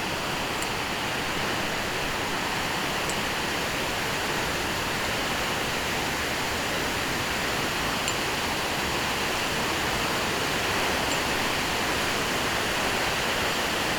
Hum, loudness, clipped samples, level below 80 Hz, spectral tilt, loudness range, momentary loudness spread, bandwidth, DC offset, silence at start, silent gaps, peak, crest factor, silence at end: none; -26 LUFS; under 0.1%; -44 dBFS; -2.5 dB/octave; 2 LU; 2 LU; over 20 kHz; under 0.1%; 0 s; none; -10 dBFS; 18 dB; 0 s